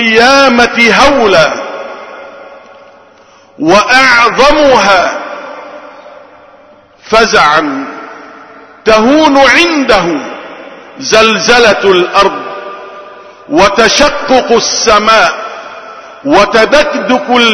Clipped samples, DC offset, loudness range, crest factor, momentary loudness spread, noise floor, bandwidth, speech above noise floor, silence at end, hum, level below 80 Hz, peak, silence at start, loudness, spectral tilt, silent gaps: 2%; under 0.1%; 3 LU; 8 dB; 21 LU; -40 dBFS; 11 kHz; 34 dB; 0 s; none; -34 dBFS; 0 dBFS; 0 s; -6 LUFS; -2.5 dB/octave; none